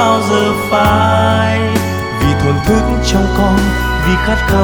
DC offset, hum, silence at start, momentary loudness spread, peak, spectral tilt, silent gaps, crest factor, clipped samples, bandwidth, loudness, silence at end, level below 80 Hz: under 0.1%; none; 0 s; 4 LU; 0 dBFS; -5.5 dB/octave; none; 12 dB; under 0.1%; over 20 kHz; -12 LUFS; 0 s; -20 dBFS